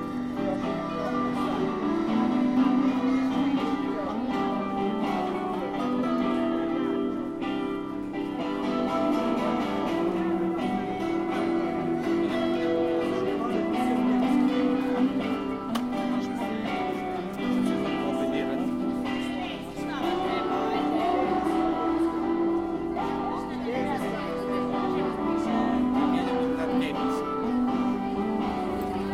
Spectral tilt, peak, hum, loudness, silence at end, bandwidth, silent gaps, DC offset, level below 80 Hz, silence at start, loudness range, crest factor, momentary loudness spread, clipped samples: -6.5 dB/octave; -12 dBFS; none; -27 LUFS; 0 s; 13.5 kHz; none; under 0.1%; -52 dBFS; 0 s; 3 LU; 14 dB; 6 LU; under 0.1%